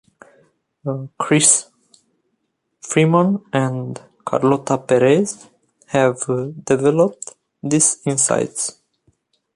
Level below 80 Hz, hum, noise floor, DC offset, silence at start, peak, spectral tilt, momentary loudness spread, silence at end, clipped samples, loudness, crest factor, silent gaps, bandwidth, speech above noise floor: -62 dBFS; none; -72 dBFS; under 0.1%; 0.85 s; 0 dBFS; -4.5 dB/octave; 17 LU; 0.85 s; under 0.1%; -17 LUFS; 20 dB; none; 11.5 kHz; 54 dB